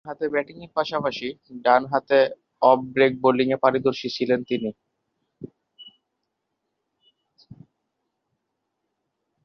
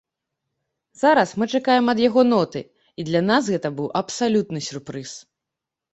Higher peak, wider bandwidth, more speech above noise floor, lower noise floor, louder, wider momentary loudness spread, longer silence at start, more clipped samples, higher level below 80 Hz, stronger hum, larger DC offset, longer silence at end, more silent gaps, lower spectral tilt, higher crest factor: about the same, -2 dBFS vs -4 dBFS; second, 6.6 kHz vs 8.2 kHz; second, 57 dB vs 65 dB; second, -79 dBFS vs -85 dBFS; about the same, -22 LUFS vs -20 LUFS; about the same, 14 LU vs 16 LU; second, 0.05 s vs 1 s; neither; second, -68 dBFS vs -62 dBFS; neither; neither; first, 3.6 s vs 0.75 s; neither; first, -6.5 dB/octave vs -5 dB/octave; about the same, 22 dB vs 18 dB